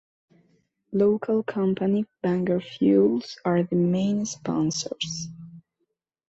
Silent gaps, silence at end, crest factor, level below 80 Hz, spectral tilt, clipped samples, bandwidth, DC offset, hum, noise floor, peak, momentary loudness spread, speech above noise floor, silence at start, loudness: none; 0.7 s; 16 dB; -64 dBFS; -6 dB/octave; under 0.1%; 8 kHz; under 0.1%; none; -78 dBFS; -8 dBFS; 9 LU; 54 dB; 0.9 s; -25 LUFS